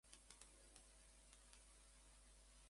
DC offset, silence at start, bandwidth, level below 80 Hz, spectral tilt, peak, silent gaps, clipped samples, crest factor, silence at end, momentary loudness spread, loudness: under 0.1%; 0.05 s; 11.5 kHz; -72 dBFS; -1.5 dB/octave; -38 dBFS; none; under 0.1%; 30 dB; 0 s; 4 LU; -66 LUFS